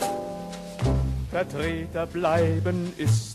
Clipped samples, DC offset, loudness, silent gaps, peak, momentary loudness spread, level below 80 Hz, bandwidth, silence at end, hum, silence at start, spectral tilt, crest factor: under 0.1%; under 0.1%; -27 LUFS; none; -10 dBFS; 10 LU; -36 dBFS; 13 kHz; 0 s; none; 0 s; -6.5 dB/octave; 16 dB